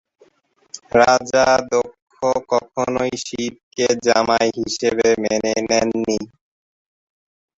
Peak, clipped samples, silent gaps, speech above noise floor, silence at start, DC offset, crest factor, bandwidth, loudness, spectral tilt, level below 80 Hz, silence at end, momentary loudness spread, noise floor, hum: -2 dBFS; under 0.1%; 2.02-2.07 s, 3.63-3.71 s; 42 dB; 0.75 s; under 0.1%; 18 dB; 8 kHz; -18 LUFS; -3.5 dB/octave; -52 dBFS; 1.3 s; 11 LU; -59 dBFS; none